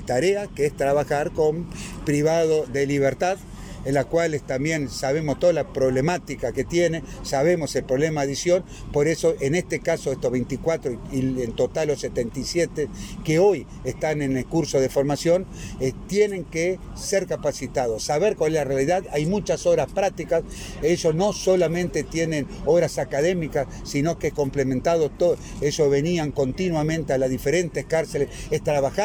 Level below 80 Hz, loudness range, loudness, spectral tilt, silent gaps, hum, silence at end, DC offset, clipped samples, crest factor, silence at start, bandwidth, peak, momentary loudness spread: -42 dBFS; 2 LU; -23 LUFS; -5.5 dB/octave; none; none; 0 s; under 0.1%; under 0.1%; 14 dB; 0 s; 17.5 kHz; -8 dBFS; 6 LU